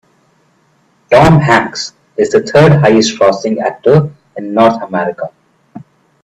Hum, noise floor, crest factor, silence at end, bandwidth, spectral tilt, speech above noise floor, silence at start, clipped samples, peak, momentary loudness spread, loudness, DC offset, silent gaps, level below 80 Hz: none; -54 dBFS; 12 dB; 0.4 s; 9.8 kHz; -6 dB/octave; 44 dB; 1.1 s; under 0.1%; 0 dBFS; 15 LU; -10 LUFS; under 0.1%; none; -40 dBFS